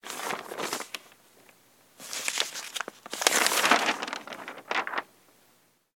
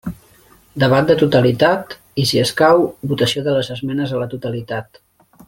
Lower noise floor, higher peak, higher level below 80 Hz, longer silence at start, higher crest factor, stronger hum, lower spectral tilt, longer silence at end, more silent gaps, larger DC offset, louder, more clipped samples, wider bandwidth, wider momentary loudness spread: first, -65 dBFS vs -50 dBFS; about the same, 0 dBFS vs -2 dBFS; second, -84 dBFS vs -50 dBFS; about the same, 0.05 s vs 0.05 s; first, 32 dB vs 16 dB; neither; second, 0 dB/octave vs -5.5 dB/octave; first, 0.95 s vs 0.65 s; neither; neither; second, -28 LUFS vs -17 LUFS; neither; about the same, 17.5 kHz vs 17 kHz; first, 17 LU vs 13 LU